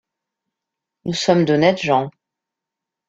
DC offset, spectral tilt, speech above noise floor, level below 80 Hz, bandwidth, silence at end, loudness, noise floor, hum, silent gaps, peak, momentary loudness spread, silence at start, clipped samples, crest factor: under 0.1%; -5.5 dB/octave; 68 dB; -60 dBFS; 8.4 kHz; 1 s; -17 LUFS; -84 dBFS; none; none; -2 dBFS; 15 LU; 1.05 s; under 0.1%; 20 dB